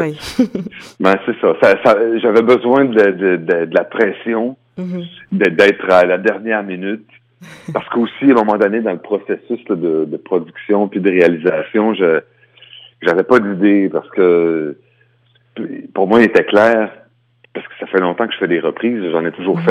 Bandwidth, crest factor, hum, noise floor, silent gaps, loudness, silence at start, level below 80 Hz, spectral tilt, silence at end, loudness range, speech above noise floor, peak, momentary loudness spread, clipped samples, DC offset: 11.5 kHz; 14 dB; none; -55 dBFS; none; -14 LUFS; 0 s; -58 dBFS; -7 dB/octave; 0 s; 4 LU; 41 dB; 0 dBFS; 14 LU; under 0.1%; under 0.1%